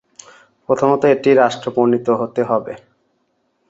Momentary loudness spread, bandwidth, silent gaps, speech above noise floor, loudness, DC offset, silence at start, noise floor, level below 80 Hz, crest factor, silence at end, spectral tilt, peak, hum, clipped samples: 8 LU; 8 kHz; none; 50 dB; -16 LUFS; under 0.1%; 0.7 s; -66 dBFS; -60 dBFS; 16 dB; 0.95 s; -6.5 dB/octave; -2 dBFS; none; under 0.1%